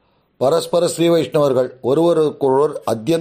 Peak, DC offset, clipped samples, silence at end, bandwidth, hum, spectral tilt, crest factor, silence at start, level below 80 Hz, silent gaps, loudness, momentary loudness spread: -4 dBFS; under 0.1%; under 0.1%; 0 s; 15.5 kHz; none; -6 dB/octave; 12 dB; 0.4 s; -60 dBFS; none; -17 LUFS; 4 LU